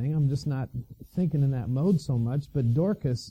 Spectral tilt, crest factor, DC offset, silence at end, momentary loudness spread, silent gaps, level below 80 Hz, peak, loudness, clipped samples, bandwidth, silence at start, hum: -8.5 dB/octave; 14 dB; under 0.1%; 0 s; 8 LU; none; -50 dBFS; -14 dBFS; -27 LUFS; under 0.1%; 9.4 kHz; 0 s; none